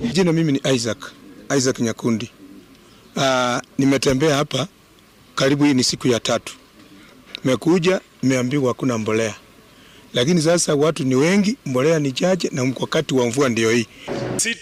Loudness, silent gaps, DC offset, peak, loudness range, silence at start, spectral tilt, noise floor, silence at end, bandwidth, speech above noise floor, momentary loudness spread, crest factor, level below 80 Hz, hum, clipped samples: -19 LUFS; none; under 0.1%; -8 dBFS; 3 LU; 0 s; -4.5 dB/octave; -50 dBFS; 0 s; 16 kHz; 32 dB; 9 LU; 12 dB; -52 dBFS; none; under 0.1%